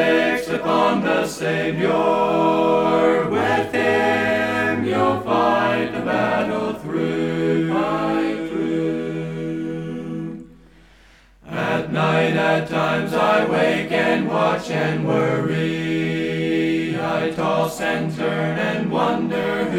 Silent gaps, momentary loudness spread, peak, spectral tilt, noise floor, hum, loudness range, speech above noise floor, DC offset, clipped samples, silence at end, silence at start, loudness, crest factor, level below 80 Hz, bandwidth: none; 7 LU; -4 dBFS; -6 dB/octave; -50 dBFS; none; 6 LU; 31 dB; under 0.1%; under 0.1%; 0 s; 0 s; -20 LUFS; 16 dB; -52 dBFS; 16 kHz